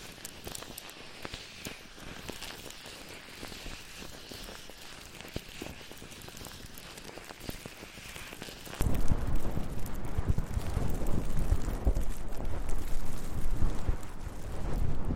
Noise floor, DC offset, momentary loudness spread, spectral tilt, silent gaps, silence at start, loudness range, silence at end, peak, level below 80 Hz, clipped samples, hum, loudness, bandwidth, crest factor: -47 dBFS; under 0.1%; 11 LU; -5 dB/octave; none; 0 s; 9 LU; 0 s; -14 dBFS; -36 dBFS; under 0.1%; none; -39 LUFS; 16 kHz; 16 dB